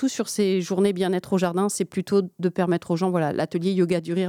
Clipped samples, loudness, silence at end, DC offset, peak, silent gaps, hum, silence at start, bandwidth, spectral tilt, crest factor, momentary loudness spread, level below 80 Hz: under 0.1%; -24 LUFS; 0 s; under 0.1%; -8 dBFS; none; none; 0 s; 16 kHz; -6 dB/octave; 14 dB; 3 LU; -68 dBFS